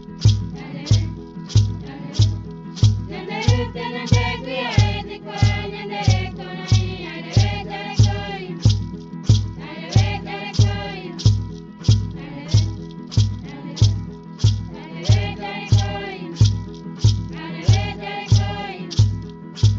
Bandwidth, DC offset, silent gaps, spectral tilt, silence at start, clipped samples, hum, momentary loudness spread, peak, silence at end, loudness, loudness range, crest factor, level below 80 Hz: 7.6 kHz; under 0.1%; none; -6 dB/octave; 0 s; under 0.1%; none; 11 LU; -2 dBFS; 0 s; -21 LUFS; 1 LU; 18 dB; -32 dBFS